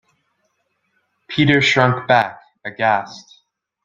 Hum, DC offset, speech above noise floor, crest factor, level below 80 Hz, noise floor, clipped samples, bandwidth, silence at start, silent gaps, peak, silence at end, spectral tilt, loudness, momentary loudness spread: none; under 0.1%; 53 dB; 20 dB; -56 dBFS; -69 dBFS; under 0.1%; 7.6 kHz; 1.3 s; none; 0 dBFS; 0.65 s; -5.5 dB/octave; -16 LUFS; 20 LU